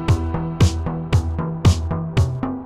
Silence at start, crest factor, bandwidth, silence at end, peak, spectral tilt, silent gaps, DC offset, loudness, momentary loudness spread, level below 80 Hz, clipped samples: 0 s; 16 dB; 12 kHz; 0 s; -2 dBFS; -6.5 dB/octave; none; 0.2%; -20 LUFS; 6 LU; -28 dBFS; under 0.1%